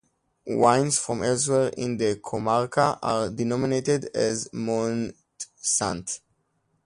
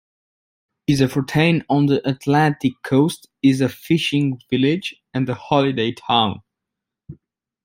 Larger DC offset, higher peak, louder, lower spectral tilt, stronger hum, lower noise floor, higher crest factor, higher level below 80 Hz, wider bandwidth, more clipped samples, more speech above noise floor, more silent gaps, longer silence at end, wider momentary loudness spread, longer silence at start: neither; about the same, -4 dBFS vs -2 dBFS; second, -25 LUFS vs -19 LUFS; second, -4.5 dB/octave vs -6.5 dB/octave; neither; second, -71 dBFS vs -84 dBFS; about the same, 20 dB vs 18 dB; about the same, -58 dBFS vs -56 dBFS; second, 11.5 kHz vs 16 kHz; neither; second, 47 dB vs 65 dB; neither; first, 0.7 s vs 0.5 s; first, 10 LU vs 7 LU; second, 0.45 s vs 0.9 s